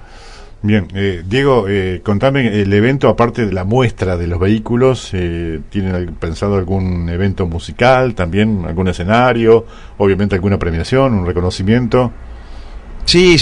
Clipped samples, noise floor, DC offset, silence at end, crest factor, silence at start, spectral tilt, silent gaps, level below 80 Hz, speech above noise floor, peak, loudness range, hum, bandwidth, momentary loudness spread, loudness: under 0.1%; -34 dBFS; under 0.1%; 0 s; 14 dB; 0 s; -6.5 dB/octave; none; -32 dBFS; 21 dB; 0 dBFS; 3 LU; none; 11 kHz; 9 LU; -14 LUFS